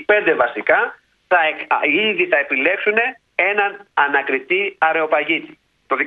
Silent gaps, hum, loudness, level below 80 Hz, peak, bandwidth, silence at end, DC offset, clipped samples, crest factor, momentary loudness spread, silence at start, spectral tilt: none; none; -17 LUFS; -68 dBFS; 0 dBFS; 5 kHz; 0 s; under 0.1%; under 0.1%; 18 dB; 5 LU; 0 s; -6 dB/octave